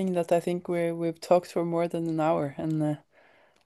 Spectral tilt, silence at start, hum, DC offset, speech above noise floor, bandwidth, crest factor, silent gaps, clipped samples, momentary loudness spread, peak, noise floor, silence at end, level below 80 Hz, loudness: -7.5 dB/octave; 0 s; none; under 0.1%; 33 dB; 12.5 kHz; 20 dB; none; under 0.1%; 5 LU; -8 dBFS; -60 dBFS; 0.65 s; -72 dBFS; -28 LUFS